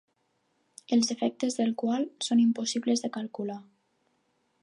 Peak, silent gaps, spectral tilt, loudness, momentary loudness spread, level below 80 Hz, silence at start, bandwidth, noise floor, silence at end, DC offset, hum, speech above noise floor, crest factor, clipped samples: -14 dBFS; none; -4 dB/octave; -28 LUFS; 11 LU; -84 dBFS; 0.9 s; 11 kHz; -74 dBFS; 1 s; under 0.1%; none; 46 dB; 16 dB; under 0.1%